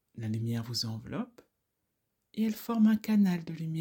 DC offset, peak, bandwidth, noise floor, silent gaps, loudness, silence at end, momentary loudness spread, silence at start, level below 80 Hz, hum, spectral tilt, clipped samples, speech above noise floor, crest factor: under 0.1%; -16 dBFS; 18 kHz; -82 dBFS; none; -31 LUFS; 0 s; 13 LU; 0.15 s; -70 dBFS; none; -6 dB/octave; under 0.1%; 52 dB; 16 dB